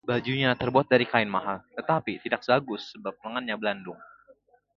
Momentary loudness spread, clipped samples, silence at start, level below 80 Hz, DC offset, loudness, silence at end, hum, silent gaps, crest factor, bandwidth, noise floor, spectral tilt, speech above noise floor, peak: 15 LU; under 0.1%; 0.05 s; -62 dBFS; under 0.1%; -27 LUFS; 0.75 s; 50 Hz at -60 dBFS; none; 24 dB; 7.2 kHz; -60 dBFS; -7 dB/octave; 33 dB; -4 dBFS